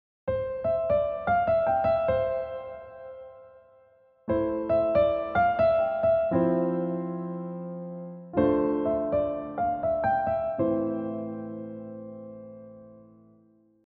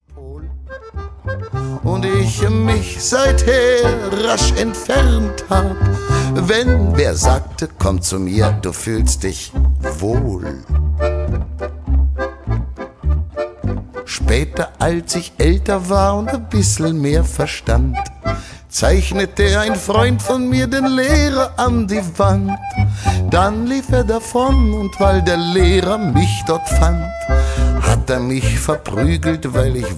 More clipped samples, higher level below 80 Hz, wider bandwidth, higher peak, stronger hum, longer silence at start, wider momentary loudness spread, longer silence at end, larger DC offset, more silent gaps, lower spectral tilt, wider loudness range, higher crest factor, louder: neither; second, -52 dBFS vs -20 dBFS; second, 4.6 kHz vs 11 kHz; second, -12 dBFS vs 0 dBFS; neither; first, 0.25 s vs 0.1 s; first, 19 LU vs 9 LU; first, 0.85 s vs 0 s; neither; neither; first, -7 dB/octave vs -5.5 dB/octave; about the same, 5 LU vs 5 LU; about the same, 16 dB vs 14 dB; second, -27 LUFS vs -17 LUFS